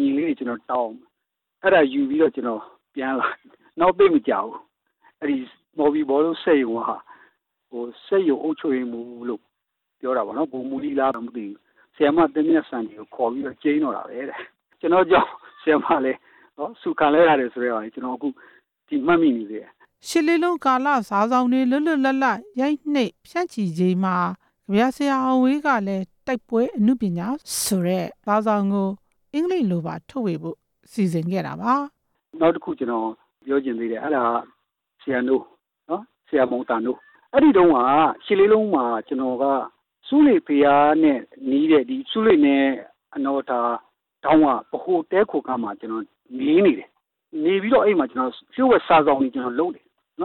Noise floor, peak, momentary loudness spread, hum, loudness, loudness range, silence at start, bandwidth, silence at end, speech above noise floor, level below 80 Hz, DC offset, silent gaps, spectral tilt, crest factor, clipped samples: -81 dBFS; -8 dBFS; 15 LU; none; -21 LUFS; 6 LU; 0 s; 15.5 kHz; 0 s; 61 dB; -60 dBFS; under 0.1%; none; -6 dB/octave; 14 dB; under 0.1%